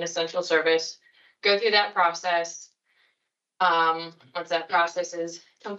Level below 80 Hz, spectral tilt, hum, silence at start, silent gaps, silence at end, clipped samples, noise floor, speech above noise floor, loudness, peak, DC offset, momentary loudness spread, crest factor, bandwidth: under -90 dBFS; -2 dB/octave; none; 0 s; none; 0 s; under 0.1%; -79 dBFS; 54 dB; -24 LUFS; -8 dBFS; under 0.1%; 15 LU; 20 dB; 8 kHz